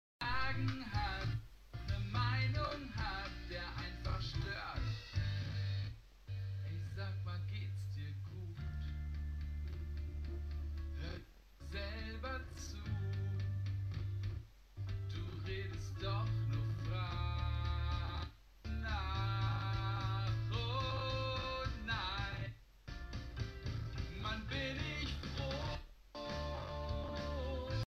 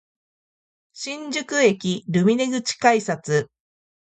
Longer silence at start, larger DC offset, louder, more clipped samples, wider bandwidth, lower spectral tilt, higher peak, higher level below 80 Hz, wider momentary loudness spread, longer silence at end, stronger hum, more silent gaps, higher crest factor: second, 0.2 s vs 0.95 s; neither; second, -42 LUFS vs -21 LUFS; neither; first, 13 kHz vs 9.2 kHz; first, -6 dB/octave vs -4.5 dB/octave; second, -24 dBFS vs -4 dBFS; first, -46 dBFS vs -68 dBFS; second, 8 LU vs 12 LU; second, 0 s vs 0.7 s; neither; neither; about the same, 18 dB vs 20 dB